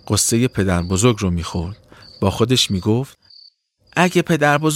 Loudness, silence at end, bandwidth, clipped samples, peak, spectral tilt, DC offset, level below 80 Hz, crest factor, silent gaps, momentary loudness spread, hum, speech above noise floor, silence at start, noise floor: -18 LUFS; 0 s; 16.5 kHz; under 0.1%; -2 dBFS; -4.5 dB/octave; under 0.1%; -42 dBFS; 18 dB; none; 10 LU; none; 36 dB; 0.05 s; -53 dBFS